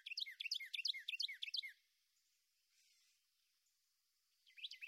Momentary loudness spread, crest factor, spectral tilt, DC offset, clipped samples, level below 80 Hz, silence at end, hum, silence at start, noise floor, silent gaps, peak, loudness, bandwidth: 11 LU; 20 dB; 8 dB/octave; under 0.1%; under 0.1%; under -90 dBFS; 0 s; none; 0.05 s; -85 dBFS; none; -30 dBFS; -44 LUFS; 16 kHz